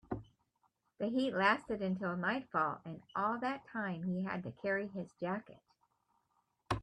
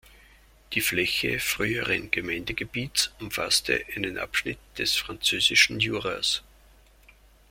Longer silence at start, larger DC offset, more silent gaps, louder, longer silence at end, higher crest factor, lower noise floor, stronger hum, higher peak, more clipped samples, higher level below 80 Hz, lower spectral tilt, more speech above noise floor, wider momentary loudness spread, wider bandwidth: second, 0.1 s vs 0.7 s; neither; neither; second, -37 LUFS vs -25 LUFS; second, 0 s vs 1.1 s; about the same, 22 dB vs 24 dB; first, -80 dBFS vs -56 dBFS; neither; second, -16 dBFS vs -4 dBFS; neither; second, -64 dBFS vs -52 dBFS; first, -7 dB/octave vs -2 dB/octave; first, 43 dB vs 29 dB; about the same, 11 LU vs 11 LU; second, 10 kHz vs 16.5 kHz